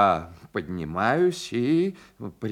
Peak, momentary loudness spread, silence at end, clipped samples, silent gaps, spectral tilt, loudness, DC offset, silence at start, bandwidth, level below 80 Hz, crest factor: -6 dBFS; 13 LU; 0 s; under 0.1%; none; -6 dB/octave; -26 LUFS; under 0.1%; 0 s; 13 kHz; -58 dBFS; 18 dB